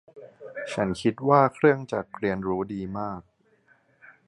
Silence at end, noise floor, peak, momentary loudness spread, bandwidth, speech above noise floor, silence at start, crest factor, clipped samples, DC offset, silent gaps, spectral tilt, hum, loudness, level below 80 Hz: 1.05 s; -63 dBFS; -6 dBFS; 17 LU; 11 kHz; 38 dB; 0.15 s; 22 dB; under 0.1%; under 0.1%; none; -7 dB/octave; none; -25 LUFS; -58 dBFS